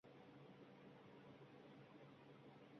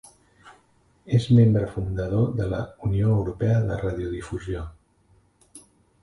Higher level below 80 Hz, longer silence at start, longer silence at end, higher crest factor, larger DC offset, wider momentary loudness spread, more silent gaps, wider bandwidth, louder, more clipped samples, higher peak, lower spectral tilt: second, under -90 dBFS vs -42 dBFS; second, 0.05 s vs 0.45 s; second, 0 s vs 0.45 s; about the same, 12 dB vs 16 dB; neither; second, 1 LU vs 14 LU; neither; second, 6.4 kHz vs 11.5 kHz; second, -64 LUFS vs -24 LUFS; neither; second, -50 dBFS vs -8 dBFS; second, -5.5 dB/octave vs -8.5 dB/octave